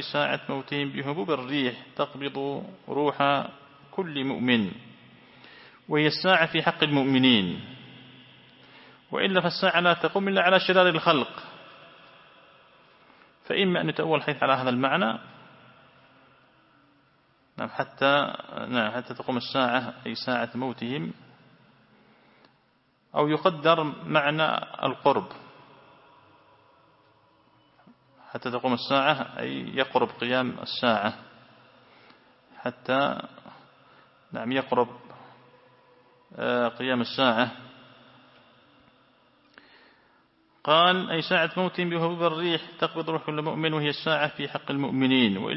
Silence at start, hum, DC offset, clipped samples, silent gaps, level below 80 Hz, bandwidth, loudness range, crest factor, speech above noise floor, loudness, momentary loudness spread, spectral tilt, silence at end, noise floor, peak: 0 s; none; under 0.1%; under 0.1%; none; -72 dBFS; 5.8 kHz; 8 LU; 22 dB; 41 dB; -25 LUFS; 14 LU; -9 dB/octave; 0 s; -66 dBFS; -4 dBFS